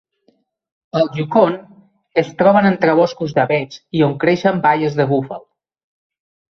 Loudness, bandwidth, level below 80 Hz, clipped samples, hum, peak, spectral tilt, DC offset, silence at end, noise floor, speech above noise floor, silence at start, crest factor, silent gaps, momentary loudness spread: -16 LUFS; 6.6 kHz; -58 dBFS; under 0.1%; none; -2 dBFS; -7.5 dB/octave; under 0.1%; 1.2 s; -61 dBFS; 46 dB; 0.95 s; 16 dB; none; 9 LU